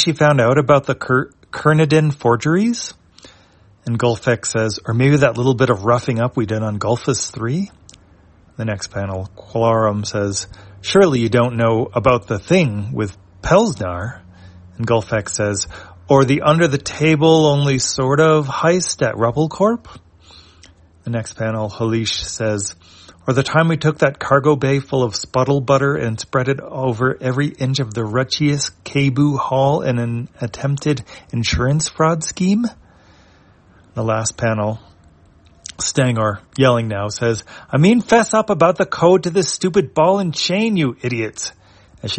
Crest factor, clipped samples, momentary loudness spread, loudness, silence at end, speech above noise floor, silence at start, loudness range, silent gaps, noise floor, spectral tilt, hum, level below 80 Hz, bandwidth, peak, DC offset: 16 dB; under 0.1%; 11 LU; -17 LUFS; 0 s; 34 dB; 0 s; 6 LU; none; -50 dBFS; -5.5 dB/octave; none; -46 dBFS; 8.8 kHz; 0 dBFS; under 0.1%